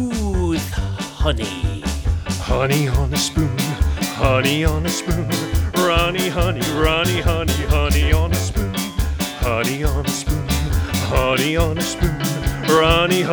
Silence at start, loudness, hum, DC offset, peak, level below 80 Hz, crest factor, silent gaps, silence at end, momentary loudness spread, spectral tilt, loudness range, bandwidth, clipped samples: 0 s; -19 LUFS; none; under 0.1%; 0 dBFS; -24 dBFS; 18 dB; none; 0 s; 6 LU; -5 dB/octave; 3 LU; over 20 kHz; under 0.1%